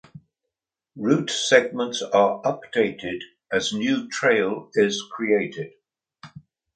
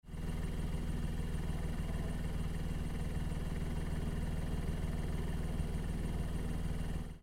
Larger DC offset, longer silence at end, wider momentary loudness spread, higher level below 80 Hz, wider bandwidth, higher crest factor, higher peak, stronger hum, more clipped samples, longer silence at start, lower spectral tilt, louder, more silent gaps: neither; first, 0.35 s vs 0 s; first, 13 LU vs 1 LU; second, -66 dBFS vs -40 dBFS; second, 9.4 kHz vs 16 kHz; first, 24 dB vs 12 dB; first, 0 dBFS vs -26 dBFS; second, none vs 60 Hz at -55 dBFS; neither; about the same, 0.15 s vs 0.05 s; second, -4 dB/octave vs -6.5 dB/octave; first, -23 LUFS vs -40 LUFS; neither